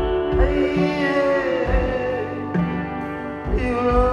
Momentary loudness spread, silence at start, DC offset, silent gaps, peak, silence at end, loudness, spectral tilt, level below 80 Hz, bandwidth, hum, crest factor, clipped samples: 8 LU; 0 s; under 0.1%; none; -6 dBFS; 0 s; -21 LUFS; -8 dB/octave; -28 dBFS; 9 kHz; none; 16 dB; under 0.1%